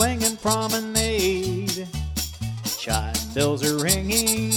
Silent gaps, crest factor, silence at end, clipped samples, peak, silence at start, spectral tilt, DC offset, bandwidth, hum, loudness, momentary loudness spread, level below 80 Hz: none; 20 dB; 0 s; under 0.1%; -4 dBFS; 0 s; -3.5 dB/octave; under 0.1%; 19.5 kHz; none; -23 LUFS; 8 LU; -36 dBFS